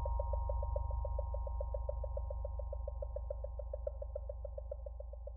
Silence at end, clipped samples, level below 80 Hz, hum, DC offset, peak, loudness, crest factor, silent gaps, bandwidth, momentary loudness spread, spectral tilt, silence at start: 0 s; under 0.1%; -40 dBFS; none; under 0.1%; -24 dBFS; -43 LUFS; 14 dB; none; 1.4 kHz; 8 LU; -10 dB/octave; 0 s